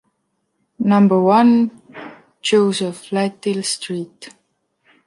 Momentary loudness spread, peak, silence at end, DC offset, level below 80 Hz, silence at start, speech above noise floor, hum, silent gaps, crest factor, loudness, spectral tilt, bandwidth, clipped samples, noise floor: 23 LU; -2 dBFS; 0.75 s; under 0.1%; -68 dBFS; 0.8 s; 54 dB; none; none; 16 dB; -17 LUFS; -5.5 dB/octave; 11.5 kHz; under 0.1%; -70 dBFS